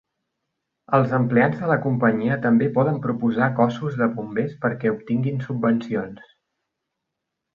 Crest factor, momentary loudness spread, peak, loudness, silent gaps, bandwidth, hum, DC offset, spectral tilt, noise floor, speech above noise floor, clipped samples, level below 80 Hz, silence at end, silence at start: 18 dB; 6 LU; -4 dBFS; -22 LUFS; none; 6.8 kHz; none; under 0.1%; -9.5 dB/octave; -81 dBFS; 60 dB; under 0.1%; -60 dBFS; 1.35 s; 0.9 s